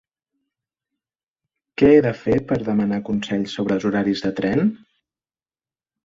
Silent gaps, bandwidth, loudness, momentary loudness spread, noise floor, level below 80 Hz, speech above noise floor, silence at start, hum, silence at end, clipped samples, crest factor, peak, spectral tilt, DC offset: none; 7.6 kHz; -20 LUFS; 9 LU; under -90 dBFS; -50 dBFS; over 71 dB; 1.8 s; none; 1.3 s; under 0.1%; 20 dB; -2 dBFS; -7.5 dB/octave; under 0.1%